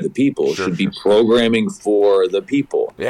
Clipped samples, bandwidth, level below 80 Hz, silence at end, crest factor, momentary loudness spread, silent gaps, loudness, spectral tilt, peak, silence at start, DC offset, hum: under 0.1%; 12 kHz; -52 dBFS; 0 s; 10 dB; 6 LU; none; -16 LUFS; -6 dB/octave; -6 dBFS; 0 s; under 0.1%; none